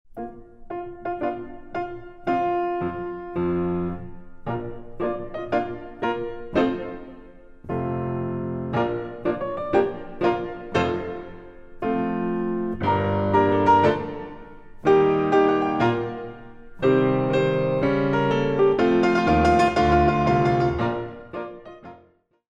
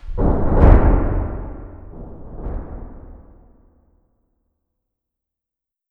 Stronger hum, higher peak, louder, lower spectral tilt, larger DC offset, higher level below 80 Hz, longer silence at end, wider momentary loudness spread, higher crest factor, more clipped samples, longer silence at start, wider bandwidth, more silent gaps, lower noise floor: neither; second, -6 dBFS vs 0 dBFS; second, -23 LUFS vs -18 LUFS; second, -7.5 dB/octave vs -11.5 dB/octave; neither; second, -42 dBFS vs -22 dBFS; second, 0.6 s vs 2.75 s; second, 17 LU vs 25 LU; about the same, 18 dB vs 20 dB; neither; about the same, 0.15 s vs 0.05 s; first, 8.8 kHz vs 3.1 kHz; neither; second, -58 dBFS vs -86 dBFS